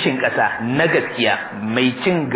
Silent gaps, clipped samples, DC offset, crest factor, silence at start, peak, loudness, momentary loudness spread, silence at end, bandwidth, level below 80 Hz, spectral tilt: none; under 0.1%; under 0.1%; 14 dB; 0 s; -4 dBFS; -18 LUFS; 3 LU; 0 s; 4 kHz; -58 dBFS; -9.5 dB/octave